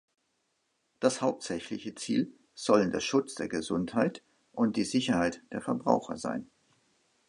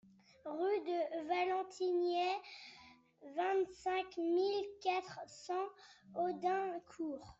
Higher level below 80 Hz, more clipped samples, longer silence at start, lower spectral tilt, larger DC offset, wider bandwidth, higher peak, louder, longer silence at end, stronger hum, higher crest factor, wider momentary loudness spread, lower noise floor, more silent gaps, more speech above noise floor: first, -64 dBFS vs -78 dBFS; neither; first, 1 s vs 0.45 s; about the same, -5 dB/octave vs -4.5 dB/octave; neither; first, 11.5 kHz vs 8 kHz; first, -8 dBFS vs -24 dBFS; first, -31 LUFS vs -39 LUFS; first, 0.85 s vs 0.05 s; neither; first, 22 dB vs 16 dB; second, 11 LU vs 14 LU; first, -77 dBFS vs -62 dBFS; neither; first, 47 dB vs 24 dB